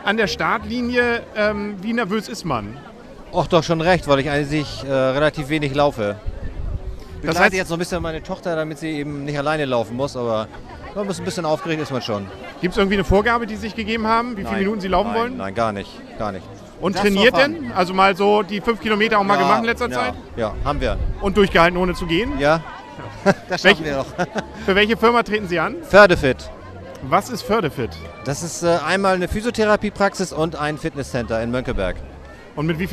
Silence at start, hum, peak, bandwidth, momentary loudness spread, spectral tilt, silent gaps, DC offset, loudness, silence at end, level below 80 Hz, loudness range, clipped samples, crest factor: 0 s; none; 0 dBFS; 13.5 kHz; 13 LU; -5 dB/octave; none; under 0.1%; -19 LUFS; 0 s; -36 dBFS; 6 LU; under 0.1%; 20 dB